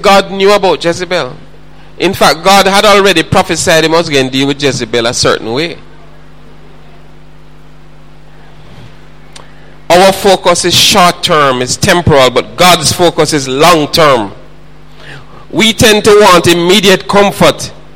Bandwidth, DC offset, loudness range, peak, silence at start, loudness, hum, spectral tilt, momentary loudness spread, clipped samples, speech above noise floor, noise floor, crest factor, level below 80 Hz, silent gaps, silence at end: over 20 kHz; 4%; 8 LU; 0 dBFS; 0 s; -7 LUFS; none; -3.5 dB/octave; 8 LU; 0.8%; 29 dB; -37 dBFS; 10 dB; -34 dBFS; none; 0.2 s